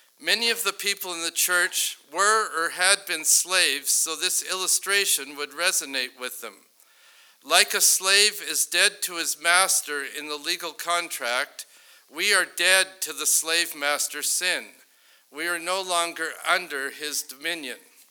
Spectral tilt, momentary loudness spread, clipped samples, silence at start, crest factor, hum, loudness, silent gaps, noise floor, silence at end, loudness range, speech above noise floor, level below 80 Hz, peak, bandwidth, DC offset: 1.5 dB/octave; 12 LU; under 0.1%; 0.2 s; 26 dB; none; -22 LUFS; none; -58 dBFS; 0.35 s; 5 LU; 34 dB; under -90 dBFS; 0 dBFS; over 20 kHz; under 0.1%